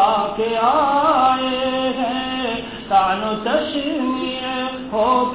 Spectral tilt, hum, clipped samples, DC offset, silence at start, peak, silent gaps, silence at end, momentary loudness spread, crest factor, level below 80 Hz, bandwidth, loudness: -8.5 dB/octave; none; under 0.1%; 0.2%; 0 s; -4 dBFS; none; 0 s; 7 LU; 14 dB; -48 dBFS; 4 kHz; -19 LUFS